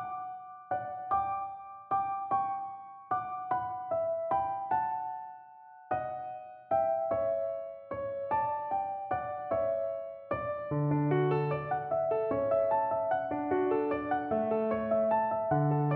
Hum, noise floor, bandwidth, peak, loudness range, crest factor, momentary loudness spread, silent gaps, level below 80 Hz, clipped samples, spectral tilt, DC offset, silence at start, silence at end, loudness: none; -53 dBFS; 4.3 kHz; -18 dBFS; 4 LU; 14 dB; 11 LU; none; -64 dBFS; under 0.1%; -7.5 dB/octave; under 0.1%; 0 s; 0 s; -32 LUFS